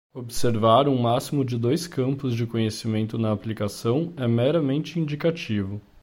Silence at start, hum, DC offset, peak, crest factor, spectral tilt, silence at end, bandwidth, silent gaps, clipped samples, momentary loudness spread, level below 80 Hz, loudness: 0.15 s; none; under 0.1%; -6 dBFS; 18 dB; -6.5 dB/octave; 0.25 s; 16.5 kHz; none; under 0.1%; 9 LU; -54 dBFS; -24 LUFS